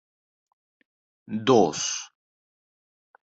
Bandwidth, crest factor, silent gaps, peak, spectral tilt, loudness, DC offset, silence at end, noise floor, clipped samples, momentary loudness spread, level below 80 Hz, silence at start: 8.2 kHz; 22 dB; none; -6 dBFS; -4 dB/octave; -23 LUFS; under 0.1%; 1.2 s; under -90 dBFS; under 0.1%; 15 LU; -70 dBFS; 1.3 s